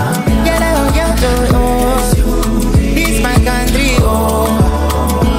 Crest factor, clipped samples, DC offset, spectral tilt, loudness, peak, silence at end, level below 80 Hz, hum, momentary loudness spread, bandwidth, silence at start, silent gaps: 10 dB; under 0.1%; under 0.1%; -5.5 dB/octave; -12 LUFS; 0 dBFS; 0 s; -16 dBFS; none; 2 LU; 16.5 kHz; 0 s; none